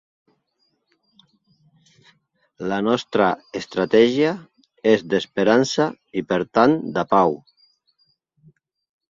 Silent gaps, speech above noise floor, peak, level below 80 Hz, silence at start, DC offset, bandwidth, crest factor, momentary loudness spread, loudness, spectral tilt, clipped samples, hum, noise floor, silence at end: none; 51 dB; -2 dBFS; -62 dBFS; 2.6 s; under 0.1%; 7.8 kHz; 20 dB; 11 LU; -20 LUFS; -5.5 dB/octave; under 0.1%; none; -70 dBFS; 1.75 s